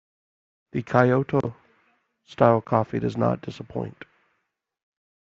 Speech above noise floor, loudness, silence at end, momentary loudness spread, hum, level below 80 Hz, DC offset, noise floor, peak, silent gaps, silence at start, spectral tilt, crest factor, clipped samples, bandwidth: 54 dB; -24 LUFS; 1.45 s; 14 LU; none; -60 dBFS; under 0.1%; -77 dBFS; -2 dBFS; none; 0.75 s; -7 dB/octave; 24 dB; under 0.1%; 7.4 kHz